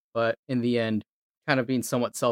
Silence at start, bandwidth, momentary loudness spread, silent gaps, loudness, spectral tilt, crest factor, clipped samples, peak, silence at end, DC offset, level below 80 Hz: 0.15 s; 16.5 kHz; 5 LU; 0.39-0.43 s, 1.12-1.41 s; -27 LUFS; -5 dB/octave; 20 dB; under 0.1%; -6 dBFS; 0 s; under 0.1%; -72 dBFS